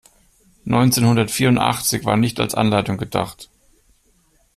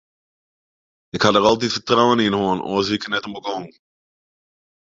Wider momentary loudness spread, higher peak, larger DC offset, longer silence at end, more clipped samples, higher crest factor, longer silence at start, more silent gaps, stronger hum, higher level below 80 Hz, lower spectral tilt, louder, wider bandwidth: second, 9 LU vs 13 LU; about the same, -2 dBFS vs -2 dBFS; neither; about the same, 1.1 s vs 1.2 s; neither; about the same, 18 dB vs 20 dB; second, 0.65 s vs 1.15 s; neither; neither; first, -48 dBFS vs -54 dBFS; about the same, -5 dB/octave vs -4.5 dB/octave; about the same, -18 LUFS vs -19 LUFS; first, 15.5 kHz vs 7.8 kHz